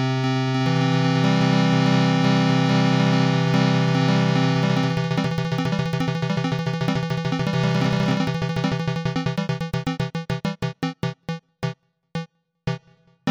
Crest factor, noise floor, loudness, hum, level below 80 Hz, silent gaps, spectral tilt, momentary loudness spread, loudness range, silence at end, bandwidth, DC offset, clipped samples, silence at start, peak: 12 dB; -55 dBFS; -22 LUFS; none; -50 dBFS; none; -6.5 dB/octave; 12 LU; 9 LU; 0 s; 9.6 kHz; under 0.1%; under 0.1%; 0 s; -10 dBFS